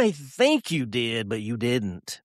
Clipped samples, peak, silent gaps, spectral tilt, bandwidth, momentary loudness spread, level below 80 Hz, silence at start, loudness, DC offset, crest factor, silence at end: under 0.1%; -8 dBFS; none; -5 dB/octave; 14 kHz; 7 LU; -62 dBFS; 0 s; -25 LUFS; under 0.1%; 18 dB; 0.1 s